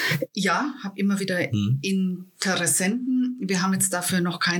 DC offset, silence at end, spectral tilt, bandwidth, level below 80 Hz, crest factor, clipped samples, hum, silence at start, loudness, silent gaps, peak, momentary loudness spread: under 0.1%; 0 s; -4 dB/octave; 19 kHz; -76 dBFS; 18 dB; under 0.1%; none; 0 s; -24 LUFS; none; -6 dBFS; 5 LU